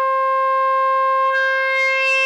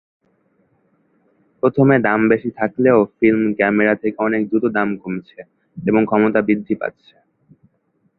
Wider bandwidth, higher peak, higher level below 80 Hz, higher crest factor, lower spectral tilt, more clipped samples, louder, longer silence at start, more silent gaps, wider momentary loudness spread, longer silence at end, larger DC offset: first, 10.5 kHz vs 4.1 kHz; second, -8 dBFS vs 0 dBFS; second, under -90 dBFS vs -58 dBFS; second, 10 dB vs 18 dB; second, 4 dB/octave vs -11.5 dB/octave; neither; about the same, -16 LUFS vs -17 LUFS; second, 0 s vs 1.65 s; neither; second, 2 LU vs 10 LU; second, 0 s vs 1.3 s; neither